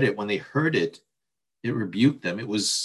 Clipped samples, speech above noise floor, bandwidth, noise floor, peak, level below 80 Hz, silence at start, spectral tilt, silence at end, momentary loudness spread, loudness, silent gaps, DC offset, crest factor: under 0.1%; 63 dB; 12.5 kHz; -88 dBFS; -8 dBFS; -66 dBFS; 0 s; -4.5 dB/octave; 0 s; 8 LU; -26 LUFS; none; under 0.1%; 16 dB